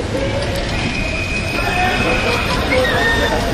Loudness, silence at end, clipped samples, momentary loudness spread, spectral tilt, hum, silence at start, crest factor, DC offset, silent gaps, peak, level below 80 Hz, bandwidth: -17 LUFS; 0 s; under 0.1%; 5 LU; -4.5 dB/octave; none; 0 s; 14 dB; under 0.1%; none; -2 dBFS; -26 dBFS; 13.5 kHz